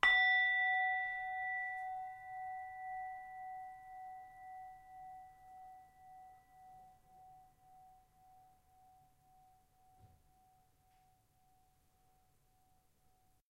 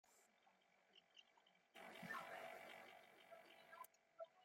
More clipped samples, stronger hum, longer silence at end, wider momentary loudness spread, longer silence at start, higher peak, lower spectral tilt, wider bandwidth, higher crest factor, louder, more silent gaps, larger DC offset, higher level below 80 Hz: neither; neither; first, 3.45 s vs 0 s; first, 28 LU vs 15 LU; about the same, 0.05 s vs 0.05 s; first, -14 dBFS vs -40 dBFS; second, -1 dB/octave vs -3 dB/octave; about the same, 15.5 kHz vs 16.5 kHz; first, 30 dB vs 22 dB; first, -36 LUFS vs -59 LUFS; neither; neither; first, -74 dBFS vs under -90 dBFS